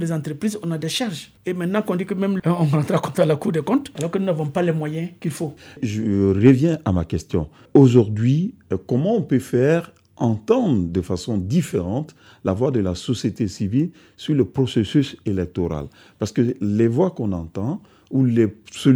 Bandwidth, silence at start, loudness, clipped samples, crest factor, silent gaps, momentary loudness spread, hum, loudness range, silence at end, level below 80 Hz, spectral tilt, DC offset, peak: over 20 kHz; 0 s; -21 LUFS; under 0.1%; 18 dB; none; 9 LU; none; 5 LU; 0 s; -48 dBFS; -7.5 dB/octave; under 0.1%; -2 dBFS